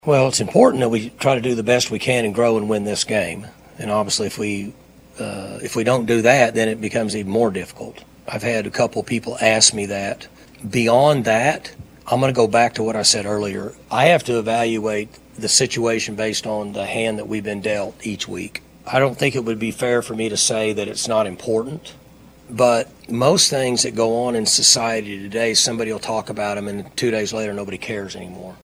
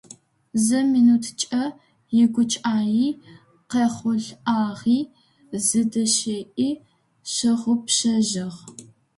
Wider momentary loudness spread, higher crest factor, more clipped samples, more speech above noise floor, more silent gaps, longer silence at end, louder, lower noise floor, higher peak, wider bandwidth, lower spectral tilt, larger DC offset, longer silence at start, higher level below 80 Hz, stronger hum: about the same, 14 LU vs 13 LU; about the same, 20 dB vs 16 dB; neither; about the same, 27 dB vs 28 dB; neither; second, 0.1 s vs 0.35 s; first, -19 LUFS vs -22 LUFS; about the same, -46 dBFS vs -49 dBFS; first, 0 dBFS vs -6 dBFS; first, over 20 kHz vs 11.5 kHz; about the same, -3 dB/octave vs -3.5 dB/octave; neither; second, 0.05 s vs 0.55 s; first, -54 dBFS vs -66 dBFS; neither